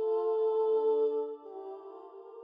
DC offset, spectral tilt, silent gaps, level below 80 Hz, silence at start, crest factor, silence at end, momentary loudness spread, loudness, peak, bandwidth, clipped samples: under 0.1%; -6.5 dB/octave; none; under -90 dBFS; 0 s; 10 dB; 0 s; 20 LU; -30 LUFS; -22 dBFS; 3.7 kHz; under 0.1%